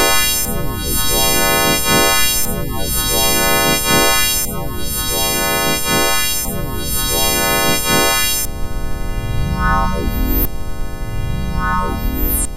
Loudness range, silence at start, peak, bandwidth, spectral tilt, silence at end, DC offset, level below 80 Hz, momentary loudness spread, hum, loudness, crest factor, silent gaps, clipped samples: 6 LU; 0 s; 0 dBFS; 14.5 kHz; -2.5 dB/octave; 0 s; under 0.1%; -24 dBFS; 11 LU; none; -15 LUFS; 16 dB; none; under 0.1%